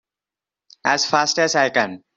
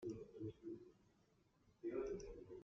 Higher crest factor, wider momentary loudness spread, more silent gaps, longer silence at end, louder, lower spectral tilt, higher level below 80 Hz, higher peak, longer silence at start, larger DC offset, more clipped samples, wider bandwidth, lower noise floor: about the same, 18 dB vs 18 dB; second, 5 LU vs 10 LU; neither; first, 0.2 s vs 0 s; first, -18 LUFS vs -51 LUFS; second, -2 dB/octave vs -8 dB/octave; about the same, -68 dBFS vs -70 dBFS; first, -2 dBFS vs -34 dBFS; first, 0.85 s vs 0 s; neither; neither; first, 8.2 kHz vs 7.4 kHz; first, -89 dBFS vs -77 dBFS